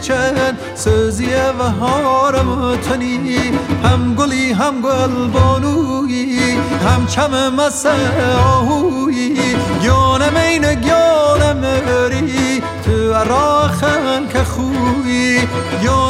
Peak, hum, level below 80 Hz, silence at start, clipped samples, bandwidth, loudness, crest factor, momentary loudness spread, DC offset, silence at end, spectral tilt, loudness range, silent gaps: 0 dBFS; none; -30 dBFS; 0 s; under 0.1%; 15.5 kHz; -14 LUFS; 12 dB; 5 LU; under 0.1%; 0 s; -5.5 dB/octave; 2 LU; none